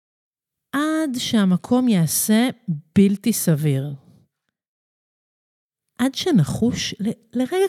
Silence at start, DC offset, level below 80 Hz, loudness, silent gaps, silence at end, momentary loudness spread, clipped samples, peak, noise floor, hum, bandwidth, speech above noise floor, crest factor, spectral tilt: 0.75 s; under 0.1%; -54 dBFS; -20 LUFS; 4.68-5.70 s; 0 s; 8 LU; under 0.1%; -4 dBFS; -67 dBFS; none; 15.5 kHz; 48 dB; 16 dB; -5 dB/octave